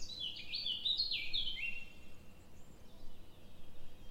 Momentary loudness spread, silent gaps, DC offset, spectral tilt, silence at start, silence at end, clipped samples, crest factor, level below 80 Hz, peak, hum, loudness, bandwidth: 26 LU; none; under 0.1%; -1.5 dB/octave; 0 s; 0 s; under 0.1%; 18 dB; -54 dBFS; -22 dBFS; none; -37 LUFS; 15.5 kHz